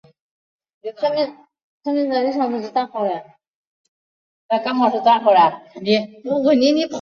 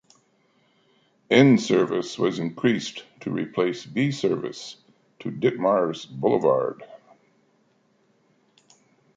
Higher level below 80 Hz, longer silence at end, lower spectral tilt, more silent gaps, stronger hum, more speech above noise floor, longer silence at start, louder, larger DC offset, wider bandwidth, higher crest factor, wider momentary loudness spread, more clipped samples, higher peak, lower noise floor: about the same, -68 dBFS vs -70 dBFS; second, 0 s vs 2.2 s; about the same, -5.5 dB/octave vs -6 dB/octave; first, 1.64-1.80 s, 3.47-4.49 s vs none; neither; first, over 72 dB vs 42 dB; second, 0.85 s vs 1.3 s; first, -19 LUFS vs -23 LUFS; neither; second, 7.2 kHz vs 9 kHz; about the same, 18 dB vs 22 dB; second, 12 LU vs 17 LU; neither; about the same, -2 dBFS vs -4 dBFS; first, under -90 dBFS vs -65 dBFS